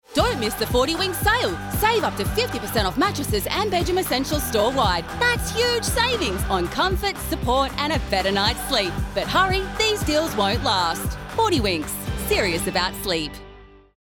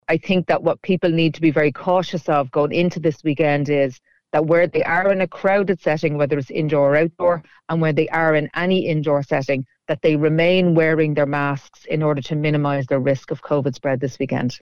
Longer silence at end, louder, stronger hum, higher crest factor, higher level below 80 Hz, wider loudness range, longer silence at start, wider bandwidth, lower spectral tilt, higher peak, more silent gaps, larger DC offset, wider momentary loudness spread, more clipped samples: first, 0.35 s vs 0.05 s; second, -22 LUFS vs -19 LUFS; neither; about the same, 16 dB vs 14 dB; first, -34 dBFS vs -56 dBFS; about the same, 1 LU vs 1 LU; about the same, 0.1 s vs 0.1 s; first, over 20 kHz vs 7 kHz; second, -4 dB/octave vs -7.5 dB/octave; about the same, -6 dBFS vs -4 dBFS; neither; second, under 0.1% vs 0.6%; about the same, 5 LU vs 6 LU; neither